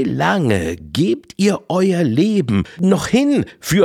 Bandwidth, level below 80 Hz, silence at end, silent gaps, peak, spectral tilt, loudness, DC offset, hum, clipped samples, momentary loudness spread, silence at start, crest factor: 16.5 kHz; -48 dBFS; 0 s; none; -2 dBFS; -6 dB/octave; -17 LUFS; under 0.1%; none; under 0.1%; 4 LU; 0 s; 14 dB